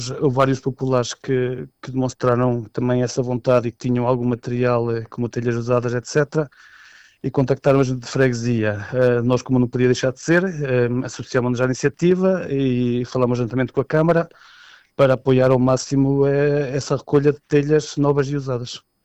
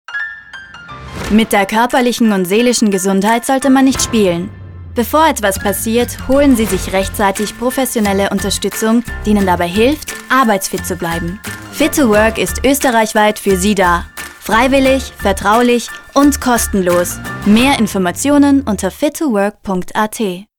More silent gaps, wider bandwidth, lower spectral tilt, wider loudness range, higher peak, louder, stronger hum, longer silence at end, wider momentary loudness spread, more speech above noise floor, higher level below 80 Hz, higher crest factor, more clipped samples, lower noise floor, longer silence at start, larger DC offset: neither; second, 8.4 kHz vs over 20 kHz; first, -6.5 dB/octave vs -4 dB/octave; about the same, 3 LU vs 2 LU; second, -6 dBFS vs -2 dBFS; second, -20 LUFS vs -13 LUFS; neither; about the same, 0.25 s vs 0.15 s; second, 7 LU vs 10 LU; first, 29 dB vs 20 dB; second, -46 dBFS vs -32 dBFS; about the same, 14 dB vs 12 dB; neither; first, -48 dBFS vs -33 dBFS; about the same, 0 s vs 0.1 s; neither